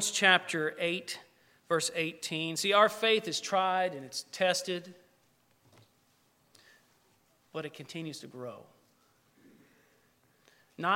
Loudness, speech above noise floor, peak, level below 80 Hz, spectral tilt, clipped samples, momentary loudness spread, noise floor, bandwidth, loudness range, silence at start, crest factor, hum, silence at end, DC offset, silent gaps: -30 LUFS; 38 dB; -8 dBFS; -84 dBFS; -2.5 dB/octave; under 0.1%; 18 LU; -69 dBFS; 16.5 kHz; 18 LU; 0 s; 26 dB; none; 0 s; under 0.1%; none